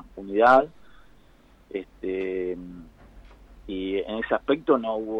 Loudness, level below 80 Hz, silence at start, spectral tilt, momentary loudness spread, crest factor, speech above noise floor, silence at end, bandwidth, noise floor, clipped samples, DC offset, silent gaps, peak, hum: -25 LUFS; -52 dBFS; 0.05 s; -6.5 dB/octave; 19 LU; 20 dB; 32 dB; 0 s; 9.4 kHz; -56 dBFS; under 0.1%; under 0.1%; none; -6 dBFS; none